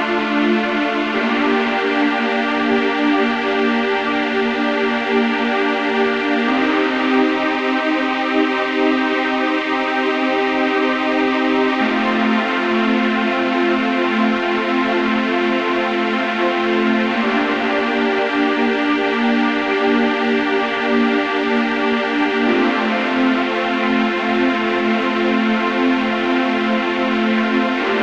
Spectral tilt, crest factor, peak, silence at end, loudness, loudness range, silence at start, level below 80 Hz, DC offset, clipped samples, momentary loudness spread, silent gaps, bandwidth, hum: -5 dB/octave; 14 dB; -4 dBFS; 0 s; -17 LUFS; 1 LU; 0 s; -56 dBFS; 0.1%; under 0.1%; 2 LU; none; 8.2 kHz; none